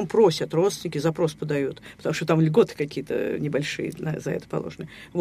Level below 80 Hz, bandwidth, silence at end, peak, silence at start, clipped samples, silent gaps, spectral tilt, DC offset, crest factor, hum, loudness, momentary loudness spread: -58 dBFS; 15 kHz; 0 s; -6 dBFS; 0 s; under 0.1%; none; -6 dB/octave; under 0.1%; 18 dB; none; -25 LUFS; 12 LU